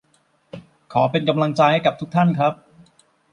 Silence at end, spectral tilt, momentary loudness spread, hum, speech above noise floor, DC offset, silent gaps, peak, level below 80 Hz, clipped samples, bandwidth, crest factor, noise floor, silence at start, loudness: 0.8 s; -7.5 dB/octave; 8 LU; none; 44 dB; under 0.1%; none; -2 dBFS; -62 dBFS; under 0.1%; 10 kHz; 18 dB; -62 dBFS; 0.55 s; -19 LUFS